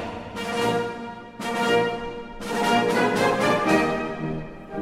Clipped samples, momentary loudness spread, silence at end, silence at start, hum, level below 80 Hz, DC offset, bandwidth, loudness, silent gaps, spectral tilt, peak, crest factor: under 0.1%; 14 LU; 0 s; 0 s; none; -48 dBFS; under 0.1%; 16 kHz; -23 LUFS; none; -4.5 dB/octave; -6 dBFS; 18 dB